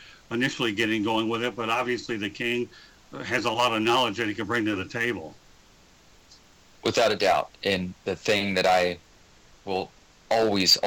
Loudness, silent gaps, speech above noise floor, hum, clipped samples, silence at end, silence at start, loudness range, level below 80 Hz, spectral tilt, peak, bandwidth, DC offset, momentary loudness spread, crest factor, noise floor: -25 LUFS; none; 30 dB; none; under 0.1%; 0 s; 0 s; 3 LU; -60 dBFS; -3.5 dB/octave; -8 dBFS; 19 kHz; under 0.1%; 11 LU; 20 dB; -56 dBFS